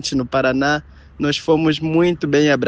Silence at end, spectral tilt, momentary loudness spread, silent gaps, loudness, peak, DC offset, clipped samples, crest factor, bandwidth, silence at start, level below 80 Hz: 0 s; -5.5 dB/octave; 5 LU; none; -18 LUFS; -2 dBFS; under 0.1%; under 0.1%; 14 dB; 9 kHz; 0 s; -44 dBFS